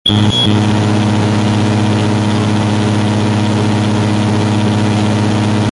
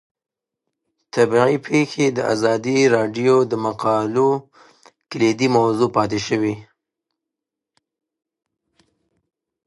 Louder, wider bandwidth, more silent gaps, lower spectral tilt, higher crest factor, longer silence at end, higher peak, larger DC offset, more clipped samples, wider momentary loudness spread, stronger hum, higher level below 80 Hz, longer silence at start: first, -13 LUFS vs -18 LUFS; about the same, 11.5 kHz vs 11.5 kHz; neither; about the same, -6 dB/octave vs -5.5 dB/octave; second, 10 dB vs 20 dB; second, 0 s vs 3.05 s; about the same, -2 dBFS vs 0 dBFS; neither; neither; second, 3 LU vs 6 LU; first, 60 Hz at -20 dBFS vs none; first, -36 dBFS vs -60 dBFS; second, 0.05 s vs 1.15 s